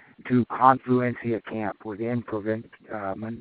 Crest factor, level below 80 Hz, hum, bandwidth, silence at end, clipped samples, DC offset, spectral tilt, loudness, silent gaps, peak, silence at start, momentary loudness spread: 24 dB; -66 dBFS; none; 4.5 kHz; 0 s; under 0.1%; under 0.1%; -7 dB/octave; -26 LUFS; none; -2 dBFS; 0.25 s; 13 LU